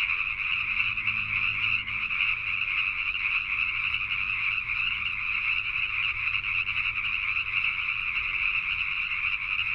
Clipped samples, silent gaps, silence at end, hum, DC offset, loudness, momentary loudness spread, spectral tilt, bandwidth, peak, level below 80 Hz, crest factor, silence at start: under 0.1%; none; 0 s; none; under 0.1%; -26 LUFS; 2 LU; -2.5 dB/octave; 9.6 kHz; -12 dBFS; -50 dBFS; 16 dB; 0 s